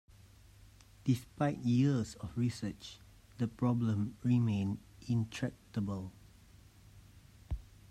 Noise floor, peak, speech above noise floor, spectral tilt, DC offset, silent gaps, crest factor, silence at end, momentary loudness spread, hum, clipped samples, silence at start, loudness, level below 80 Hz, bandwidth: -59 dBFS; -18 dBFS; 26 dB; -7.5 dB/octave; under 0.1%; none; 18 dB; 0.3 s; 15 LU; none; under 0.1%; 1.05 s; -35 LUFS; -56 dBFS; 13 kHz